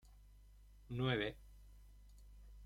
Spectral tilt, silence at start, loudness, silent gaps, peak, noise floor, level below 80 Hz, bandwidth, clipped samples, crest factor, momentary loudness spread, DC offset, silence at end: -7 dB/octave; 0.05 s; -41 LUFS; none; -22 dBFS; -62 dBFS; -60 dBFS; 14 kHz; under 0.1%; 24 dB; 26 LU; under 0.1%; 0 s